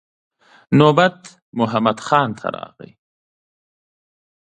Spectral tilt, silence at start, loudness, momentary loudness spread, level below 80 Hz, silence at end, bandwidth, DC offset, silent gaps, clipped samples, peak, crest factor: -6.5 dB/octave; 0.7 s; -17 LUFS; 17 LU; -62 dBFS; 1.9 s; 9.6 kHz; under 0.1%; 1.42-1.53 s; under 0.1%; 0 dBFS; 20 dB